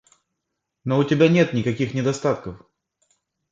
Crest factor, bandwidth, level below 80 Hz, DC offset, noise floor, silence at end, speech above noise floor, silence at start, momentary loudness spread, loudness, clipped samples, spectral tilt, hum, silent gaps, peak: 20 dB; 7.8 kHz; -56 dBFS; under 0.1%; -80 dBFS; 0.95 s; 60 dB; 0.85 s; 13 LU; -21 LUFS; under 0.1%; -6.5 dB/octave; none; none; -4 dBFS